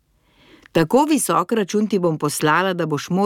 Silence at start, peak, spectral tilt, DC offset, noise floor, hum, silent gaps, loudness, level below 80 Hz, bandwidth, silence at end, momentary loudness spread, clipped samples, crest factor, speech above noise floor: 0.75 s; -4 dBFS; -5 dB/octave; under 0.1%; -56 dBFS; none; none; -19 LUFS; -58 dBFS; 17.5 kHz; 0 s; 5 LU; under 0.1%; 16 dB; 38 dB